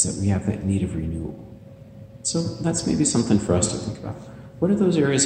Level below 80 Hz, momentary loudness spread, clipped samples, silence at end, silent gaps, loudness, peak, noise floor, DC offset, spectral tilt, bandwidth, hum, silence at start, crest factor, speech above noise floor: -44 dBFS; 20 LU; under 0.1%; 0 s; none; -23 LUFS; -6 dBFS; -43 dBFS; under 0.1%; -5 dB/octave; 10 kHz; none; 0 s; 18 dB; 20 dB